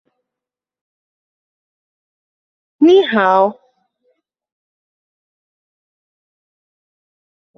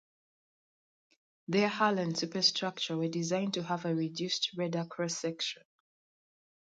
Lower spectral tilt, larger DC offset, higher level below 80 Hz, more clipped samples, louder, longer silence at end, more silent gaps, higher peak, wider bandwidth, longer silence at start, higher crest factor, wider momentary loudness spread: first, -6 dB/octave vs -4 dB/octave; neither; first, -68 dBFS vs -80 dBFS; neither; first, -13 LUFS vs -32 LUFS; first, 4.05 s vs 1.15 s; neither; first, -2 dBFS vs -12 dBFS; second, 6.4 kHz vs 9.4 kHz; first, 2.8 s vs 1.5 s; about the same, 20 dB vs 22 dB; about the same, 5 LU vs 7 LU